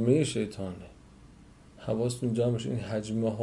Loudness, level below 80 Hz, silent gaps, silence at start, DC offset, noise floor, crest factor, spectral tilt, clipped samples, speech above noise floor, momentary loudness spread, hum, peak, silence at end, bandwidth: -31 LUFS; -58 dBFS; none; 0 s; under 0.1%; -54 dBFS; 18 dB; -6.5 dB/octave; under 0.1%; 25 dB; 15 LU; none; -12 dBFS; 0 s; 11.5 kHz